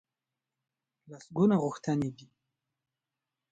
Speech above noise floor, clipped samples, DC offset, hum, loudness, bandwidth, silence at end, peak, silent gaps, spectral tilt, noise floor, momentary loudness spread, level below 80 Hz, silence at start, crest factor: 60 dB; under 0.1%; under 0.1%; none; -30 LUFS; 9 kHz; 1.4 s; -14 dBFS; none; -8 dB/octave; -90 dBFS; 11 LU; -70 dBFS; 1.1 s; 20 dB